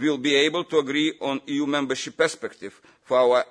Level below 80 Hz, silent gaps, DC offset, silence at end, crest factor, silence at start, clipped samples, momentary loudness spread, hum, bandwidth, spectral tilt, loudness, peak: -72 dBFS; none; under 0.1%; 0.05 s; 16 dB; 0 s; under 0.1%; 14 LU; none; 10.5 kHz; -3.5 dB/octave; -23 LUFS; -8 dBFS